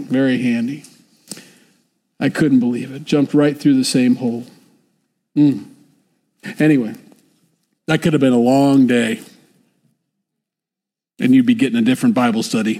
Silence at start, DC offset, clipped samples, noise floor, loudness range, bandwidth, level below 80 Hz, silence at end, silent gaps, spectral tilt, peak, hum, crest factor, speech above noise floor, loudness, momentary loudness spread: 0 s; under 0.1%; under 0.1%; -86 dBFS; 4 LU; 14.5 kHz; -62 dBFS; 0 s; none; -6 dB/octave; -4 dBFS; none; 14 dB; 71 dB; -16 LUFS; 16 LU